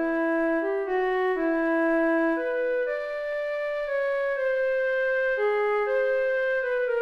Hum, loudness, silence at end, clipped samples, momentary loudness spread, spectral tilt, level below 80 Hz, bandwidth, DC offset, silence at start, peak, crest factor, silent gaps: none; -25 LUFS; 0 s; under 0.1%; 5 LU; -5 dB/octave; -56 dBFS; 6.4 kHz; under 0.1%; 0 s; -16 dBFS; 10 dB; none